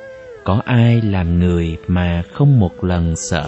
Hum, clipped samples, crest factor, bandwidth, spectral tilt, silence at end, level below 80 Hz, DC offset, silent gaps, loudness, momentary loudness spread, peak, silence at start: none; under 0.1%; 14 dB; 8.4 kHz; -7 dB/octave; 0 s; -32 dBFS; under 0.1%; none; -16 LUFS; 7 LU; 0 dBFS; 0 s